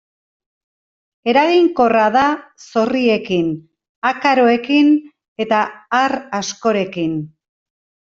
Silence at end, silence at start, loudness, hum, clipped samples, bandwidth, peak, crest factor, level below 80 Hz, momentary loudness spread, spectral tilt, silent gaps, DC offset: 0.9 s; 1.25 s; -16 LUFS; none; under 0.1%; 7.6 kHz; -2 dBFS; 14 dB; -58 dBFS; 10 LU; -5 dB/octave; 3.89-4.02 s, 5.28-5.36 s; under 0.1%